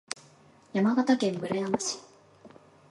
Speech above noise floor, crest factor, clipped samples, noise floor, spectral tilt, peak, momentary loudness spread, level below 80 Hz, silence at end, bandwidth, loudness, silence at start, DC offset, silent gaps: 31 dB; 20 dB; under 0.1%; -57 dBFS; -4.5 dB/octave; -10 dBFS; 15 LU; -72 dBFS; 0.4 s; 11.5 kHz; -28 LUFS; 0.75 s; under 0.1%; none